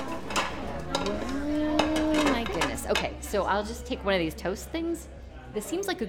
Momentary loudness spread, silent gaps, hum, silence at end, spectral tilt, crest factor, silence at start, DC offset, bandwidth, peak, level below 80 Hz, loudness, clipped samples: 9 LU; none; none; 0 s; -4 dB/octave; 22 dB; 0 s; under 0.1%; 19 kHz; -8 dBFS; -42 dBFS; -29 LUFS; under 0.1%